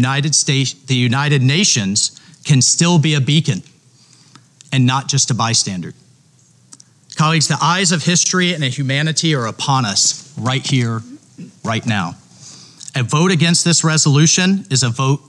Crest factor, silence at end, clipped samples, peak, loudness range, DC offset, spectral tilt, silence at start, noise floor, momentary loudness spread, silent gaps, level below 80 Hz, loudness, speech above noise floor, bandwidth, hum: 14 dB; 0.1 s; under 0.1%; -2 dBFS; 5 LU; under 0.1%; -3.5 dB/octave; 0 s; -51 dBFS; 10 LU; none; -62 dBFS; -15 LUFS; 36 dB; 11.5 kHz; none